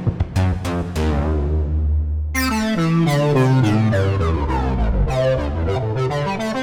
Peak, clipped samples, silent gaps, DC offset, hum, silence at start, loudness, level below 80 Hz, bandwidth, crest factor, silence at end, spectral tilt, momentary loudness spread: -6 dBFS; under 0.1%; none; under 0.1%; none; 0 s; -19 LUFS; -24 dBFS; over 20 kHz; 12 dB; 0 s; -7 dB/octave; 6 LU